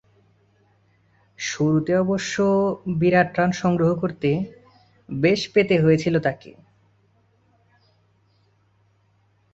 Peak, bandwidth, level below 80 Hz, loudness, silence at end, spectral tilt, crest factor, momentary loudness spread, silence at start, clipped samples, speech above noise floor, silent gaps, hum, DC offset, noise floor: -4 dBFS; 8 kHz; -56 dBFS; -21 LUFS; 3.05 s; -6 dB/octave; 18 dB; 9 LU; 1.4 s; under 0.1%; 42 dB; none; none; under 0.1%; -63 dBFS